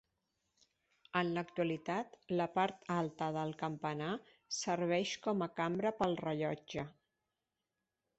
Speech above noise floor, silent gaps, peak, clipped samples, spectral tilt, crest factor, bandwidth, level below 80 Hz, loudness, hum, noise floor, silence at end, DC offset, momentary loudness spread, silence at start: 52 dB; none; -18 dBFS; under 0.1%; -4.5 dB/octave; 22 dB; 8 kHz; -74 dBFS; -38 LUFS; none; -89 dBFS; 1.3 s; under 0.1%; 7 LU; 1.15 s